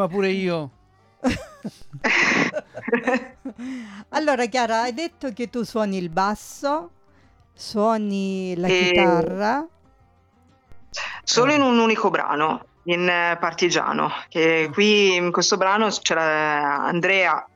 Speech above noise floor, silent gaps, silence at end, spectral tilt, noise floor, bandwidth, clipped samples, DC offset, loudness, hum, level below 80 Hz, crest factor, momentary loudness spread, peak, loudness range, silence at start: 37 dB; none; 0.1 s; -4 dB/octave; -58 dBFS; 14 kHz; under 0.1%; under 0.1%; -21 LUFS; none; -54 dBFS; 18 dB; 13 LU; -4 dBFS; 6 LU; 0 s